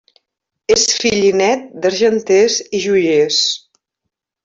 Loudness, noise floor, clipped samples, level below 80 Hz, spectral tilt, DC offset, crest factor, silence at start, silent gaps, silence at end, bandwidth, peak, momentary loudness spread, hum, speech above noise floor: -14 LUFS; -78 dBFS; under 0.1%; -54 dBFS; -2.5 dB/octave; under 0.1%; 14 dB; 0.7 s; none; 0.85 s; 7.8 kHz; -2 dBFS; 5 LU; none; 64 dB